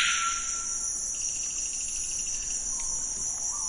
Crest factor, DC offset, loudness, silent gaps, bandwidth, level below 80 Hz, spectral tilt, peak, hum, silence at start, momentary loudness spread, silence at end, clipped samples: 18 dB; under 0.1%; -28 LUFS; none; 11.5 kHz; -50 dBFS; 2 dB/octave; -12 dBFS; none; 0 s; 2 LU; 0 s; under 0.1%